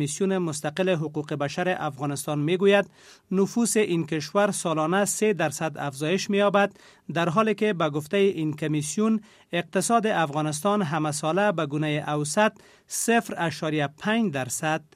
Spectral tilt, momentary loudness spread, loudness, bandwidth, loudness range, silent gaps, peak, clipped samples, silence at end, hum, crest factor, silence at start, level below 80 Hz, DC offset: -4.5 dB/octave; 7 LU; -25 LUFS; 15.5 kHz; 1 LU; none; -6 dBFS; under 0.1%; 0.15 s; none; 18 dB; 0 s; -70 dBFS; under 0.1%